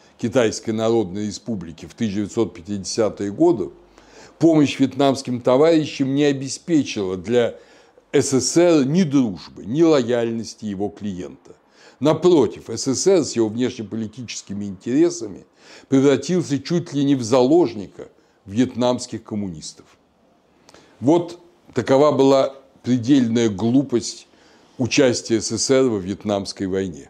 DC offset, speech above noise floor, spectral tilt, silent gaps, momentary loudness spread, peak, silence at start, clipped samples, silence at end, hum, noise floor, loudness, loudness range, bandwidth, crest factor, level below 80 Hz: under 0.1%; 39 dB; -5.5 dB/octave; none; 14 LU; -4 dBFS; 0.2 s; under 0.1%; 0.05 s; none; -58 dBFS; -20 LUFS; 4 LU; 12 kHz; 16 dB; -60 dBFS